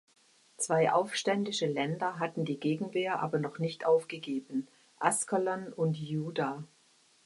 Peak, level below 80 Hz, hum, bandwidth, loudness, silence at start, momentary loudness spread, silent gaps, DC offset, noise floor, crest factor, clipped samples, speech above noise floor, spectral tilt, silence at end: -12 dBFS; -78 dBFS; none; 11.5 kHz; -32 LUFS; 0.6 s; 9 LU; none; under 0.1%; -66 dBFS; 22 dB; under 0.1%; 34 dB; -4.5 dB/octave; 0.6 s